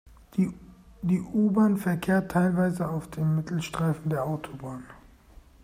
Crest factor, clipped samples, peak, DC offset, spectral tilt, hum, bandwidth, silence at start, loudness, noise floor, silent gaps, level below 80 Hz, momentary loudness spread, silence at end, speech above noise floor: 14 dB; under 0.1%; -12 dBFS; under 0.1%; -7.5 dB/octave; none; 15.5 kHz; 0.05 s; -27 LUFS; -53 dBFS; none; -54 dBFS; 13 LU; 0.65 s; 27 dB